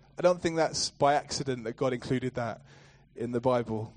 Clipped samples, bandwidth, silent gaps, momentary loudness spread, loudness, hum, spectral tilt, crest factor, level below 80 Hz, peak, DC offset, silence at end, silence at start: under 0.1%; 10 kHz; none; 9 LU; -30 LUFS; none; -4.5 dB/octave; 20 dB; -60 dBFS; -10 dBFS; under 0.1%; 0.05 s; 0.2 s